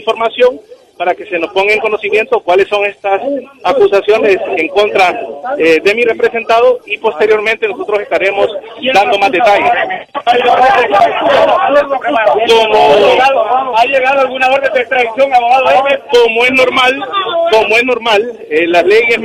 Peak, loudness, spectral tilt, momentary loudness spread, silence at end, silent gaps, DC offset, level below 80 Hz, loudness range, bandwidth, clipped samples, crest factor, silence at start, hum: 0 dBFS; -10 LUFS; -3.5 dB/octave; 7 LU; 0 s; none; under 0.1%; -50 dBFS; 3 LU; 14 kHz; under 0.1%; 10 dB; 0 s; none